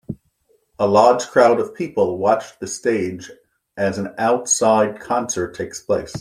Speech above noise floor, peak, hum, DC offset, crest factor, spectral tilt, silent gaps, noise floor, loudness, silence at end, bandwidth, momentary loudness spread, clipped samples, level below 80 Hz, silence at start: 44 dB; -2 dBFS; none; under 0.1%; 18 dB; -4 dB/octave; none; -62 dBFS; -19 LUFS; 0 s; 14.5 kHz; 13 LU; under 0.1%; -58 dBFS; 0.1 s